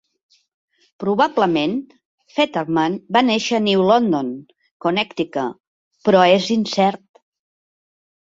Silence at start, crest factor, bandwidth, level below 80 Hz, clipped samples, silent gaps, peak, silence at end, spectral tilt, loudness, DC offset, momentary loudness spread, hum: 1 s; 18 dB; 7.8 kHz; -62 dBFS; under 0.1%; 2.05-2.18 s, 4.71-4.80 s, 5.60-5.91 s; -2 dBFS; 1.35 s; -5.5 dB/octave; -18 LUFS; under 0.1%; 13 LU; none